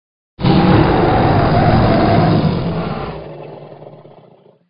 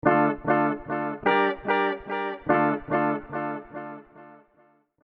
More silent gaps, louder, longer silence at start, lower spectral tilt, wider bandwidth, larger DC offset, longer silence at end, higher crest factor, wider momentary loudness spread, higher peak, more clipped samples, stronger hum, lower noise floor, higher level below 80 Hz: neither; first, -13 LUFS vs -25 LUFS; first, 0.4 s vs 0.05 s; first, -11 dB/octave vs -9 dB/octave; about the same, 5.4 kHz vs 5.6 kHz; neither; second, 0.6 s vs 0.75 s; second, 14 dB vs 22 dB; first, 20 LU vs 14 LU; first, 0 dBFS vs -4 dBFS; neither; neither; second, -47 dBFS vs -62 dBFS; first, -30 dBFS vs -56 dBFS